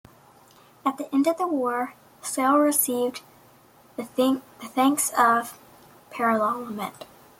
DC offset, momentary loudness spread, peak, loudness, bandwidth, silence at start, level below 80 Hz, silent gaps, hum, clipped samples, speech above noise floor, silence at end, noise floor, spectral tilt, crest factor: under 0.1%; 17 LU; -6 dBFS; -24 LUFS; 16.5 kHz; 0.85 s; -72 dBFS; none; none; under 0.1%; 31 dB; 0.35 s; -55 dBFS; -3 dB/octave; 20 dB